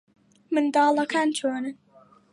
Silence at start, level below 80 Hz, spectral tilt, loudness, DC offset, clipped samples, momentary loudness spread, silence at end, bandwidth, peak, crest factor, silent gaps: 0.5 s; -80 dBFS; -3 dB/octave; -24 LUFS; under 0.1%; under 0.1%; 10 LU; 0.6 s; 11.5 kHz; -10 dBFS; 16 dB; none